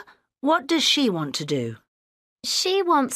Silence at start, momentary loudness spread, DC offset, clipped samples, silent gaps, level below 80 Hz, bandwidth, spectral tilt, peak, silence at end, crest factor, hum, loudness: 0.45 s; 10 LU; under 0.1%; under 0.1%; 1.88-2.36 s; -72 dBFS; 15.5 kHz; -3 dB/octave; -8 dBFS; 0 s; 16 dB; none; -22 LUFS